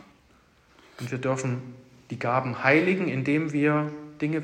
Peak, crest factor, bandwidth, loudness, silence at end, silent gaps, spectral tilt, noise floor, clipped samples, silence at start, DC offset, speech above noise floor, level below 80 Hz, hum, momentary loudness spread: -6 dBFS; 22 dB; 9.8 kHz; -26 LUFS; 0 s; none; -6.5 dB/octave; -60 dBFS; under 0.1%; 1 s; under 0.1%; 35 dB; -68 dBFS; none; 14 LU